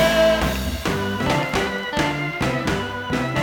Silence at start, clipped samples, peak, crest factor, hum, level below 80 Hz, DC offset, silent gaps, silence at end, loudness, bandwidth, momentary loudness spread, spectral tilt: 0 s; under 0.1%; -4 dBFS; 16 dB; none; -34 dBFS; under 0.1%; none; 0 s; -22 LUFS; over 20 kHz; 7 LU; -5 dB/octave